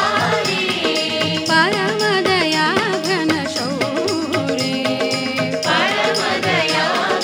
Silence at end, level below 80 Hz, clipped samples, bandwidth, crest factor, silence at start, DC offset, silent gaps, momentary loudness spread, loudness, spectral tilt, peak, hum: 0 s; -62 dBFS; under 0.1%; over 20 kHz; 16 dB; 0 s; under 0.1%; none; 4 LU; -17 LUFS; -3.5 dB/octave; -2 dBFS; none